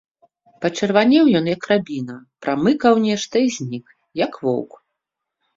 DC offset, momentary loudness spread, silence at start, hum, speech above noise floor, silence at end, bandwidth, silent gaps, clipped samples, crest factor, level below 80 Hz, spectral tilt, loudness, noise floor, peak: under 0.1%; 15 LU; 0.6 s; none; 63 dB; 0.9 s; 7.8 kHz; none; under 0.1%; 18 dB; -60 dBFS; -5.5 dB/octave; -19 LUFS; -81 dBFS; -2 dBFS